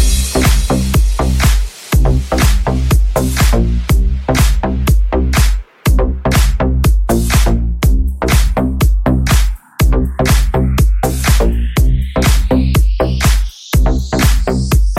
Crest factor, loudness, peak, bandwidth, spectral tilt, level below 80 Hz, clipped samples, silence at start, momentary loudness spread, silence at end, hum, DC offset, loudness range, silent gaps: 10 dB; -14 LUFS; 0 dBFS; 16 kHz; -5.5 dB/octave; -12 dBFS; under 0.1%; 0 s; 3 LU; 0 s; none; under 0.1%; 0 LU; none